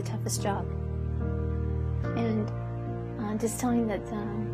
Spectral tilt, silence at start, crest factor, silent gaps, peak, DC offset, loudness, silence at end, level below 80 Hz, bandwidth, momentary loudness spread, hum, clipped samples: -6.5 dB/octave; 0 s; 14 dB; none; -16 dBFS; under 0.1%; -31 LUFS; 0 s; -38 dBFS; 15 kHz; 6 LU; none; under 0.1%